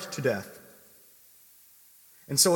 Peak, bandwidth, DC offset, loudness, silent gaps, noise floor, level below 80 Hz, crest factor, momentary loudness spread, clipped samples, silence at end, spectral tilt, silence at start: -6 dBFS; 17.5 kHz; under 0.1%; -28 LUFS; none; -57 dBFS; -76 dBFS; 24 dB; 24 LU; under 0.1%; 0 s; -2.5 dB/octave; 0 s